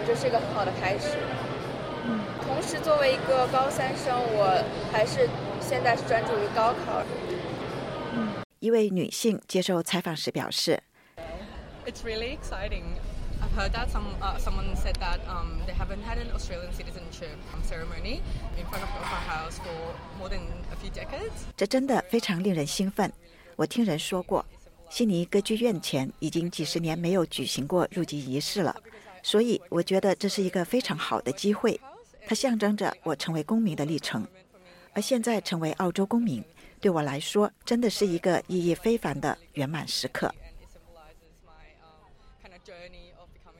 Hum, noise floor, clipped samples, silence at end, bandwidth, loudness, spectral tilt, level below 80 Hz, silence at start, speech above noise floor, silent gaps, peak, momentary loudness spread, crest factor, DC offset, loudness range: none; -55 dBFS; under 0.1%; 0.1 s; 16.5 kHz; -28 LUFS; -5 dB/octave; -40 dBFS; 0 s; 27 dB; 8.44-8.50 s; -12 dBFS; 12 LU; 18 dB; under 0.1%; 9 LU